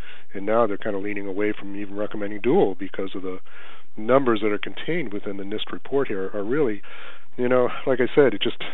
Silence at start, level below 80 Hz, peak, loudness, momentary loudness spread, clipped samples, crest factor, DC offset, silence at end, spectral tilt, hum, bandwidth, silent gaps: 0.05 s; -72 dBFS; -2 dBFS; -24 LUFS; 15 LU; under 0.1%; 20 dB; 7%; 0 s; -4 dB/octave; none; 4.1 kHz; none